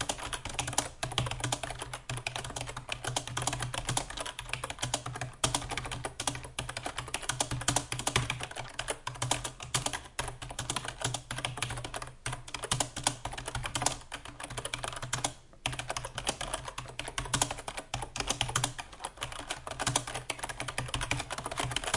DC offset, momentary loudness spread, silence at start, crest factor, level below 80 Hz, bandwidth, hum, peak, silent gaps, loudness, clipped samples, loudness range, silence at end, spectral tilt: under 0.1%; 8 LU; 0 s; 26 dB; -50 dBFS; 11.5 kHz; none; -10 dBFS; none; -35 LUFS; under 0.1%; 2 LU; 0 s; -2 dB/octave